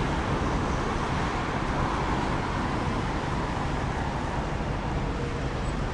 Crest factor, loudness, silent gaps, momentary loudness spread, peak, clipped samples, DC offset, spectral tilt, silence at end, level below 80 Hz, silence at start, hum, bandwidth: 14 dB; -29 LUFS; none; 3 LU; -14 dBFS; under 0.1%; under 0.1%; -6 dB/octave; 0 s; -34 dBFS; 0 s; none; 11 kHz